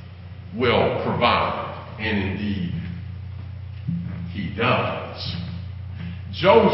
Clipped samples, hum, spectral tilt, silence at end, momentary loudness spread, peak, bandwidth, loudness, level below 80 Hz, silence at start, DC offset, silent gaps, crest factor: under 0.1%; none; -10.5 dB/octave; 0 s; 16 LU; -2 dBFS; 5.8 kHz; -24 LUFS; -40 dBFS; 0 s; under 0.1%; none; 22 dB